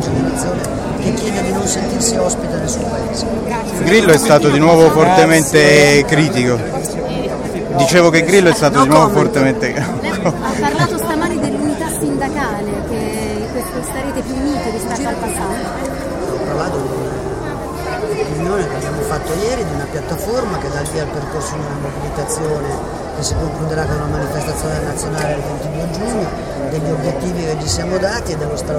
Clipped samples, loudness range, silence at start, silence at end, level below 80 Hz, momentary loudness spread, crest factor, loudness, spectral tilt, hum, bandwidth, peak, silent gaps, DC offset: under 0.1%; 10 LU; 0 s; 0 s; -32 dBFS; 12 LU; 16 dB; -16 LUFS; -5 dB/octave; none; 16.5 kHz; 0 dBFS; none; under 0.1%